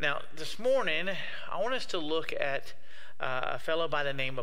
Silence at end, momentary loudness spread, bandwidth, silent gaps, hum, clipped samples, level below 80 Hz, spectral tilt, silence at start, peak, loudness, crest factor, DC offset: 0 s; 10 LU; 16 kHz; none; none; under 0.1%; -66 dBFS; -4 dB/octave; 0 s; -12 dBFS; -32 LUFS; 20 dB; 3%